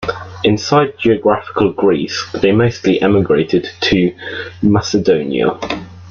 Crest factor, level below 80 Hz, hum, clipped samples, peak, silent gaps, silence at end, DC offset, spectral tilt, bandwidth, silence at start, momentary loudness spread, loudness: 14 dB; -44 dBFS; none; under 0.1%; -2 dBFS; none; 0 s; under 0.1%; -6 dB/octave; 7.2 kHz; 0 s; 8 LU; -14 LUFS